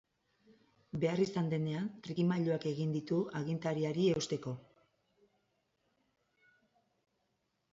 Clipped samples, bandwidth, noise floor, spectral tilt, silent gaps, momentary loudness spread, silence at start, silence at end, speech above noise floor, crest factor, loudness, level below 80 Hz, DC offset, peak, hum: under 0.1%; 7.6 kHz; -81 dBFS; -7 dB/octave; none; 8 LU; 0.95 s; 3.15 s; 47 dB; 18 dB; -35 LUFS; -74 dBFS; under 0.1%; -20 dBFS; none